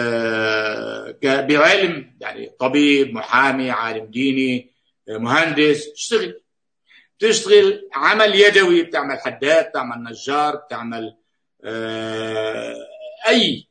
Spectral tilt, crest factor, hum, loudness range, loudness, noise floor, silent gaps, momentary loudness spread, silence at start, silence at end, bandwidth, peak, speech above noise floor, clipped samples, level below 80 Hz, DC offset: -3.5 dB/octave; 18 dB; none; 7 LU; -17 LUFS; -61 dBFS; none; 17 LU; 0 s; 0.1 s; 9.6 kHz; 0 dBFS; 43 dB; under 0.1%; -68 dBFS; under 0.1%